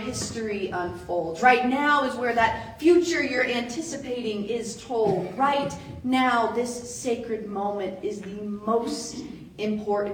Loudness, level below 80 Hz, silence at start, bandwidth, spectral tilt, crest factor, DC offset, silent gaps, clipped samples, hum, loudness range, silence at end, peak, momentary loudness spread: -25 LUFS; -56 dBFS; 0 s; 18.5 kHz; -4 dB/octave; 22 dB; under 0.1%; none; under 0.1%; none; 6 LU; 0 s; -4 dBFS; 12 LU